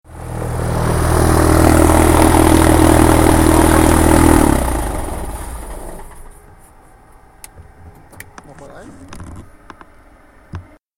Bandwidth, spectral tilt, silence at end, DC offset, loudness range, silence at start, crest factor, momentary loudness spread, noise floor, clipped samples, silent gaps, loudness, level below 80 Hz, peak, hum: 17.5 kHz; -5.5 dB/octave; 0.35 s; under 0.1%; 17 LU; 0.15 s; 14 dB; 24 LU; -45 dBFS; under 0.1%; none; -12 LUFS; -22 dBFS; 0 dBFS; none